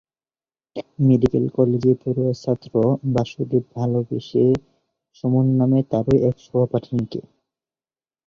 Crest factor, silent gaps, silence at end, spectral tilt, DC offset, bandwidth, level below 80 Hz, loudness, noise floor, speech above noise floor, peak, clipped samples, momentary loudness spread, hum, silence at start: 18 dB; none; 1.05 s; -9.5 dB/octave; under 0.1%; 7 kHz; -50 dBFS; -20 LUFS; under -90 dBFS; over 71 dB; -2 dBFS; under 0.1%; 8 LU; none; 0.75 s